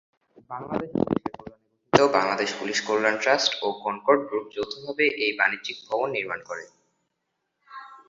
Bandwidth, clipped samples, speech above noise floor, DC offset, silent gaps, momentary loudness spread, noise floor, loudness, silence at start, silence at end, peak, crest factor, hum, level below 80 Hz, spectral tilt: 7.8 kHz; under 0.1%; 53 dB; under 0.1%; none; 16 LU; -79 dBFS; -24 LUFS; 0.5 s; 0.1 s; -2 dBFS; 24 dB; none; -62 dBFS; -3.5 dB/octave